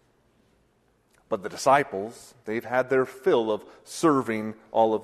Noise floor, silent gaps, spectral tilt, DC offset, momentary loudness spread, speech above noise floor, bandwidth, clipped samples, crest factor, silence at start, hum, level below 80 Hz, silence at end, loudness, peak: -66 dBFS; none; -5 dB/octave; under 0.1%; 12 LU; 41 dB; 13.5 kHz; under 0.1%; 20 dB; 1.3 s; none; -68 dBFS; 0 s; -25 LUFS; -6 dBFS